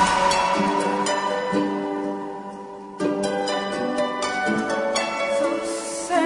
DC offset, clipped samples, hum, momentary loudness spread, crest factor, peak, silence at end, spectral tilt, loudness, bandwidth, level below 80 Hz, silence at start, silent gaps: under 0.1%; under 0.1%; none; 10 LU; 16 dB; -8 dBFS; 0 s; -3.5 dB/octave; -23 LUFS; 11 kHz; -54 dBFS; 0 s; none